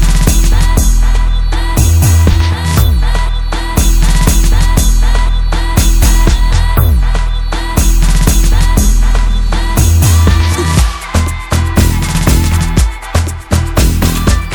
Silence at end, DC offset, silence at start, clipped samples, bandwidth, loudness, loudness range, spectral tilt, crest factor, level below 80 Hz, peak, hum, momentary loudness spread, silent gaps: 0 s; under 0.1%; 0 s; 0.3%; over 20 kHz; -12 LUFS; 1 LU; -4.5 dB/octave; 8 dB; -10 dBFS; 0 dBFS; none; 6 LU; none